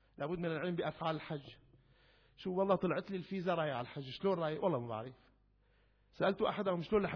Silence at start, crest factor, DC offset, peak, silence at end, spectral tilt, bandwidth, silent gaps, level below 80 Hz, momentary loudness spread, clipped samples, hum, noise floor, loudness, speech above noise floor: 0.2 s; 18 dB; under 0.1%; -20 dBFS; 0 s; -5 dB/octave; 5.4 kHz; none; -68 dBFS; 11 LU; under 0.1%; none; -71 dBFS; -38 LUFS; 35 dB